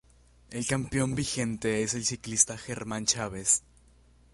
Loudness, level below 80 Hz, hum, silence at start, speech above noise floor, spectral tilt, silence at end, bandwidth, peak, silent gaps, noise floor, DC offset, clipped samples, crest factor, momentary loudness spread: -28 LUFS; -54 dBFS; none; 0.5 s; 30 dB; -3 dB/octave; 0.75 s; 11.5 kHz; -6 dBFS; none; -59 dBFS; under 0.1%; under 0.1%; 24 dB; 9 LU